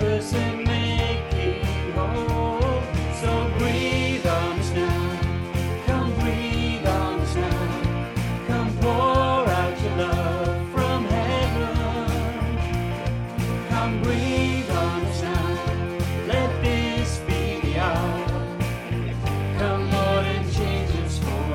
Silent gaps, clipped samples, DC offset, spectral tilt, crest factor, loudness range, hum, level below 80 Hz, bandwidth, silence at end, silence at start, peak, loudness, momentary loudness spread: none; under 0.1%; under 0.1%; -6 dB/octave; 16 dB; 2 LU; none; -34 dBFS; 16.5 kHz; 0 s; 0 s; -8 dBFS; -24 LUFS; 4 LU